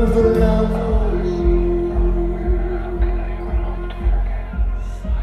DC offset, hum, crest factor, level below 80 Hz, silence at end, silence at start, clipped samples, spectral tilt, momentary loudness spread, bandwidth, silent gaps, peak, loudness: under 0.1%; none; 14 dB; -20 dBFS; 0 s; 0 s; under 0.1%; -9 dB/octave; 9 LU; 5.8 kHz; none; -4 dBFS; -20 LUFS